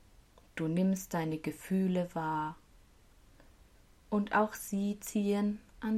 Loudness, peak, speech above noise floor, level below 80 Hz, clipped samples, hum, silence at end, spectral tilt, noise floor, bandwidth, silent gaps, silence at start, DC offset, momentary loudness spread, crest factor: -34 LUFS; -18 dBFS; 28 dB; -62 dBFS; under 0.1%; none; 0 s; -6.5 dB/octave; -61 dBFS; 15.5 kHz; none; 0.55 s; under 0.1%; 8 LU; 18 dB